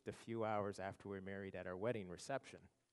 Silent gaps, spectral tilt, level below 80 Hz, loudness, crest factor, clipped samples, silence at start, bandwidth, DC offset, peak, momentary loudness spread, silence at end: none; -6 dB/octave; -80 dBFS; -47 LUFS; 18 dB; under 0.1%; 0.05 s; 11.5 kHz; under 0.1%; -28 dBFS; 8 LU; 0.25 s